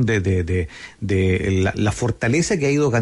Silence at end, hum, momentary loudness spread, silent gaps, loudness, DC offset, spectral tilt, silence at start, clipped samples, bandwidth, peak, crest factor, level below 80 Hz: 0 s; none; 6 LU; none; -20 LUFS; under 0.1%; -6 dB/octave; 0 s; under 0.1%; 11.5 kHz; -8 dBFS; 12 dB; -40 dBFS